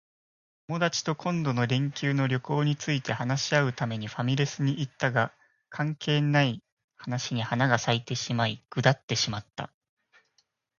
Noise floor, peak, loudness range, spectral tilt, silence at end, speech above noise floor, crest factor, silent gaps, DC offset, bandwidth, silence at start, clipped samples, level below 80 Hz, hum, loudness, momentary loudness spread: -72 dBFS; -6 dBFS; 1 LU; -5 dB/octave; 1.1 s; 45 dB; 22 dB; 6.72-6.77 s, 6.84-6.88 s, 9.03-9.08 s; under 0.1%; 7.2 kHz; 0.7 s; under 0.1%; -64 dBFS; none; -28 LUFS; 8 LU